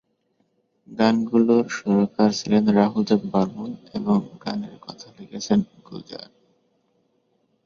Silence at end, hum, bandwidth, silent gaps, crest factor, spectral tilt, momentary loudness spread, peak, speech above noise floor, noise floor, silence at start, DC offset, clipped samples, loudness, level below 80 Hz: 1.4 s; none; 7.4 kHz; none; 20 dB; -6.5 dB/octave; 20 LU; -4 dBFS; 47 dB; -69 dBFS; 0.9 s; under 0.1%; under 0.1%; -21 LUFS; -62 dBFS